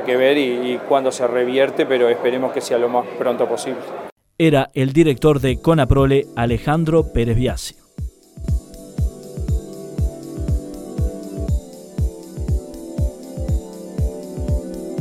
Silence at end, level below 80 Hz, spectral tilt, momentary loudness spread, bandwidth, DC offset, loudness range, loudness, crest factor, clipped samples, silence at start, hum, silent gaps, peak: 0 s; -28 dBFS; -6.5 dB/octave; 14 LU; 15.5 kHz; under 0.1%; 9 LU; -20 LUFS; 18 dB; under 0.1%; 0 s; none; 4.12-4.16 s; 0 dBFS